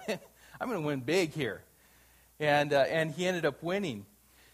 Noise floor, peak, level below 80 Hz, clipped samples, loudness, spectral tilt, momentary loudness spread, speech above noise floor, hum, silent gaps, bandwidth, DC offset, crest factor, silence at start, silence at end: -62 dBFS; -12 dBFS; -68 dBFS; under 0.1%; -31 LUFS; -5 dB/octave; 13 LU; 32 dB; none; none; 15.5 kHz; under 0.1%; 20 dB; 0 s; 0.5 s